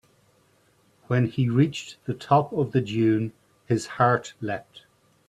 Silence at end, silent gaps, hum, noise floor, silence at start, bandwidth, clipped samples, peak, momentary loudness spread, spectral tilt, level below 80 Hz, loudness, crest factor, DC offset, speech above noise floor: 0.5 s; none; none; -63 dBFS; 1.1 s; 11 kHz; under 0.1%; -4 dBFS; 12 LU; -7 dB/octave; -62 dBFS; -25 LUFS; 20 dB; under 0.1%; 39 dB